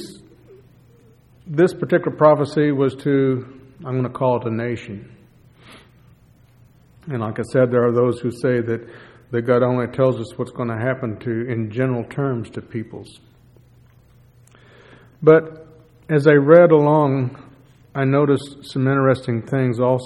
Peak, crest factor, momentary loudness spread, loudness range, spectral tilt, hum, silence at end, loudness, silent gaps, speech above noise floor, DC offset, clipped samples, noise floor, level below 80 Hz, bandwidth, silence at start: 0 dBFS; 20 dB; 15 LU; 11 LU; -8.5 dB/octave; none; 0 s; -19 LUFS; none; 33 dB; under 0.1%; under 0.1%; -51 dBFS; -58 dBFS; 11.5 kHz; 0 s